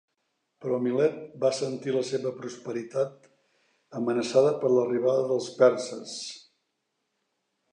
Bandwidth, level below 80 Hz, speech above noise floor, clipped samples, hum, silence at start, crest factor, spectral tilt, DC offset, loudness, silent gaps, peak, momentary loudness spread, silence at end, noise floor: 10 kHz; -82 dBFS; 53 dB; under 0.1%; none; 0.6 s; 22 dB; -5.5 dB/octave; under 0.1%; -27 LUFS; none; -6 dBFS; 14 LU; 1.35 s; -79 dBFS